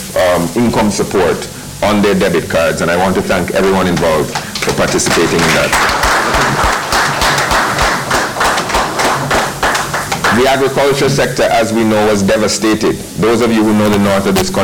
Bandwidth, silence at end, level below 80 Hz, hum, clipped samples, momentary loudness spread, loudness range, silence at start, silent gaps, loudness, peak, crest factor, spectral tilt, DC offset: 19.5 kHz; 0 s; -32 dBFS; none; under 0.1%; 4 LU; 2 LU; 0 s; none; -12 LUFS; -4 dBFS; 8 dB; -4 dB/octave; under 0.1%